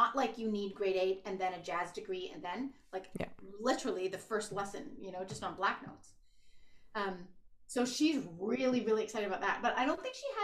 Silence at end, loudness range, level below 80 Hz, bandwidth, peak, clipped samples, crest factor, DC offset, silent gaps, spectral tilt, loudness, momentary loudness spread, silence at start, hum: 0 s; 6 LU; -66 dBFS; 14 kHz; -16 dBFS; under 0.1%; 20 dB; under 0.1%; none; -4 dB/octave; -37 LUFS; 11 LU; 0 s; none